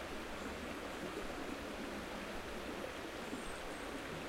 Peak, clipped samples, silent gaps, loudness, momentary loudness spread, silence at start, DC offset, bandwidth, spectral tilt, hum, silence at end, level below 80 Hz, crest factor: -30 dBFS; under 0.1%; none; -45 LUFS; 1 LU; 0 s; under 0.1%; 16 kHz; -4 dB/octave; none; 0 s; -56 dBFS; 16 dB